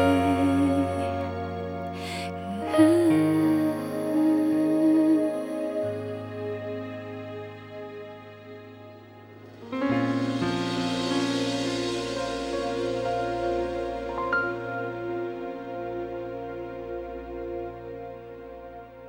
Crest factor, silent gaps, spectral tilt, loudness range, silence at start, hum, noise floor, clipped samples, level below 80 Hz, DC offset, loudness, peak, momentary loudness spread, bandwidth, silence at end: 20 dB; none; -6 dB/octave; 13 LU; 0 s; none; -47 dBFS; under 0.1%; -54 dBFS; under 0.1%; -27 LUFS; -6 dBFS; 20 LU; 16.5 kHz; 0 s